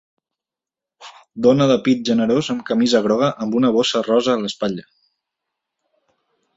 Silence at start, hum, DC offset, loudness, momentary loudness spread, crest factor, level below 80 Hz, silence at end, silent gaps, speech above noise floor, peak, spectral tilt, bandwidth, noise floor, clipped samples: 1 s; none; under 0.1%; -18 LUFS; 8 LU; 18 dB; -60 dBFS; 1.75 s; none; 71 dB; -2 dBFS; -5.5 dB/octave; 8 kHz; -88 dBFS; under 0.1%